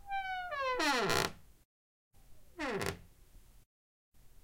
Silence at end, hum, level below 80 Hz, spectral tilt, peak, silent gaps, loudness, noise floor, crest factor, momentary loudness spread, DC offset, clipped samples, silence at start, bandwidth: 0.05 s; none; -58 dBFS; -3 dB/octave; -14 dBFS; 1.65-2.11 s, 3.66-4.12 s; -35 LUFS; -59 dBFS; 24 dB; 11 LU; under 0.1%; under 0.1%; 0.05 s; 16.5 kHz